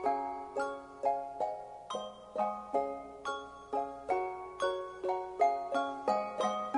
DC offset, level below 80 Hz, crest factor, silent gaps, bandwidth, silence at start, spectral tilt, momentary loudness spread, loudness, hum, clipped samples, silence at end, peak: under 0.1%; -68 dBFS; 18 dB; none; 10.5 kHz; 0 s; -4 dB/octave; 10 LU; -36 LUFS; 60 Hz at -70 dBFS; under 0.1%; 0 s; -18 dBFS